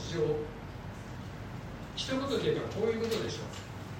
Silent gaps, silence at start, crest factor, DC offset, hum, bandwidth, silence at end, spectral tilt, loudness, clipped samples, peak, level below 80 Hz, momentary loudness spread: none; 0 s; 18 dB; under 0.1%; none; 16 kHz; 0 s; -5.5 dB/octave; -35 LUFS; under 0.1%; -18 dBFS; -52 dBFS; 12 LU